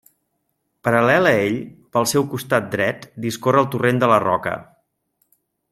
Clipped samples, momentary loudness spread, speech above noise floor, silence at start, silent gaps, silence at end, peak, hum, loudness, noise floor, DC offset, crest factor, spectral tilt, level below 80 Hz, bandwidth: under 0.1%; 12 LU; 54 dB; 0.85 s; none; 1.1 s; -2 dBFS; none; -19 LUFS; -72 dBFS; under 0.1%; 18 dB; -5 dB/octave; -60 dBFS; 16 kHz